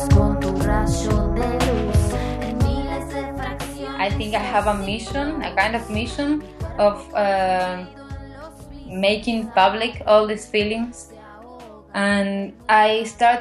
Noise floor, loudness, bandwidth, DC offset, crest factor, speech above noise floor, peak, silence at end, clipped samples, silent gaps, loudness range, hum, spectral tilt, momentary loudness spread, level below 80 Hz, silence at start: -41 dBFS; -21 LUFS; 13.5 kHz; under 0.1%; 18 dB; 21 dB; -4 dBFS; 0 s; under 0.1%; none; 3 LU; none; -5.5 dB/octave; 19 LU; -30 dBFS; 0 s